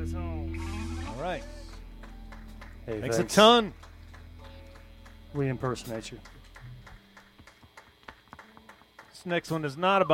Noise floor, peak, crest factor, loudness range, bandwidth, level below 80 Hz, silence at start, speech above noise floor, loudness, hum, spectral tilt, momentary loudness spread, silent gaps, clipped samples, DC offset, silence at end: -55 dBFS; -6 dBFS; 26 dB; 14 LU; 16.5 kHz; -46 dBFS; 0 s; 29 dB; -28 LUFS; none; -4.5 dB/octave; 26 LU; none; under 0.1%; under 0.1%; 0 s